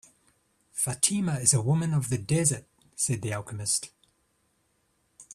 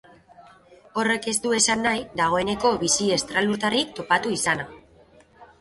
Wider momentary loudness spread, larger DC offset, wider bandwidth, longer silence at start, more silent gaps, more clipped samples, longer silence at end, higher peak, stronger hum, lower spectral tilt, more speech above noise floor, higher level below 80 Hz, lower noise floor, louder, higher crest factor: first, 13 LU vs 5 LU; neither; first, 14.5 kHz vs 12 kHz; first, 0.75 s vs 0.4 s; neither; neither; second, 0 s vs 0.15 s; about the same, -6 dBFS vs -6 dBFS; neither; first, -4 dB/octave vs -2.5 dB/octave; first, 45 dB vs 31 dB; second, -62 dBFS vs -56 dBFS; first, -71 dBFS vs -54 dBFS; second, -26 LUFS vs -22 LUFS; first, 24 dB vs 18 dB